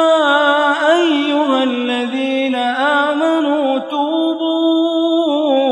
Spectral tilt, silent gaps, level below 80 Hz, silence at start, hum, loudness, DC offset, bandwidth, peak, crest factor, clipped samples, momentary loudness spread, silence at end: -3 dB/octave; none; -72 dBFS; 0 s; none; -15 LUFS; under 0.1%; 10.5 kHz; -2 dBFS; 14 dB; under 0.1%; 6 LU; 0 s